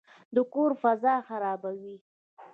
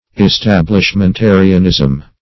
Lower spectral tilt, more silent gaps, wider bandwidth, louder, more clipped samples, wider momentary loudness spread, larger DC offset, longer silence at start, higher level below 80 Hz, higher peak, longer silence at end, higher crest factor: first, -8.5 dB/octave vs -6.5 dB/octave; first, 2.01-2.37 s vs none; second, 4.7 kHz vs 6.2 kHz; second, -28 LUFS vs -10 LUFS; second, under 0.1% vs 0.4%; first, 13 LU vs 3 LU; second, under 0.1% vs 1%; first, 0.3 s vs 0.15 s; second, -84 dBFS vs -28 dBFS; second, -12 dBFS vs 0 dBFS; second, 0.05 s vs 0.2 s; first, 18 dB vs 10 dB